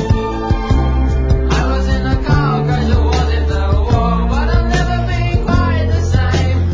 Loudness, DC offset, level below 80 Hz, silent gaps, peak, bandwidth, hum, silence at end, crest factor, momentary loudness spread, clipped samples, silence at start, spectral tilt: -15 LUFS; under 0.1%; -16 dBFS; none; 0 dBFS; 7.6 kHz; none; 0 s; 12 dB; 2 LU; under 0.1%; 0 s; -7 dB/octave